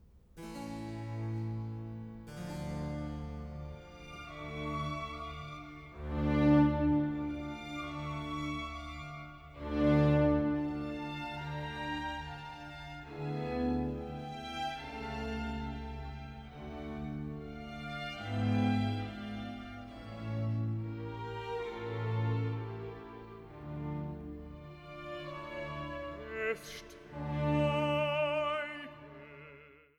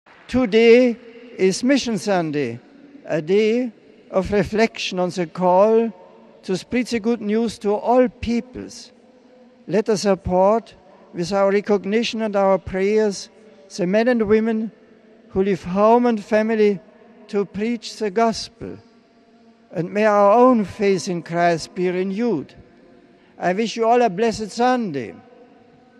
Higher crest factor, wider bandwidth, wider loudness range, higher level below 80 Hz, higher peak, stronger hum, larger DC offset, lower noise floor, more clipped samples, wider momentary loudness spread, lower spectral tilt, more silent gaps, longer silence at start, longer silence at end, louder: about the same, 20 dB vs 18 dB; about the same, 12.5 kHz vs 12 kHz; first, 9 LU vs 4 LU; about the same, -50 dBFS vs -50 dBFS; second, -16 dBFS vs -2 dBFS; neither; neither; first, -57 dBFS vs -53 dBFS; neither; first, 17 LU vs 14 LU; first, -7.5 dB/octave vs -5.5 dB/octave; neither; second, 0.05 s vs 0.3 s; second, 0.2 s vs 0.8 s; second, -36 LUFS vs -19 LUFS